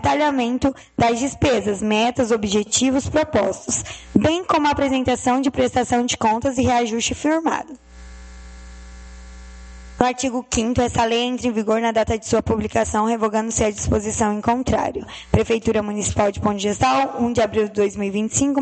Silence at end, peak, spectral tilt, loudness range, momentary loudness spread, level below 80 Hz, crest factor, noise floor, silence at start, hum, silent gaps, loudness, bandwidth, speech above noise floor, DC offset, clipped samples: 0 s; 0 dBFS; -4.5 dB/octave; 5 LU; 4 LU; -40 dBFS; 20 dB; -39 dBFS; 0 s; none; none; -20 LUFS; 9 kHz; 20 dB; under 0.1%; under 0.1%